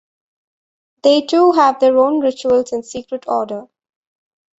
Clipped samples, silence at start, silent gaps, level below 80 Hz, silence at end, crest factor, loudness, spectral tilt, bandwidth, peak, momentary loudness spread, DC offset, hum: under 0.1%; 1.05 s; none; -60 dBFS; 0.95 s; 16 dB; -15 LUFS; -4 dB/octave; 8 kHz; -2 dBFS; 14 LU; under 0.1%; none